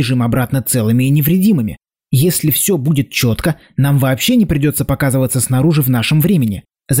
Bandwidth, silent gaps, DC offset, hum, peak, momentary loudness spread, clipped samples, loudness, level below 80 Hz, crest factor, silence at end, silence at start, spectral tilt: 16.5 kHz; none; 0.2%; none; -4 dBFS; 5 LU; under 0.1%; -14 LUFS; -38 dBFS; 10 dB; 0 s; 0 s; -5.5 dB/octave